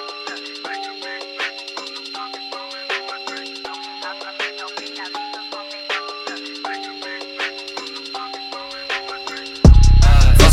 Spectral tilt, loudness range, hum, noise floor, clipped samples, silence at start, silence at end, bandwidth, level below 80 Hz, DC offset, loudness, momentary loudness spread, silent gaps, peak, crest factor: -5 dB/octave; 9 LU; none; -31 dBFS; under 0.1%; 0 s; 0 s; 13.5 kHz; -20 dBFS; under 0.1%; -21 LUFS; 16 LU; none; 0 dBFS; 18 dB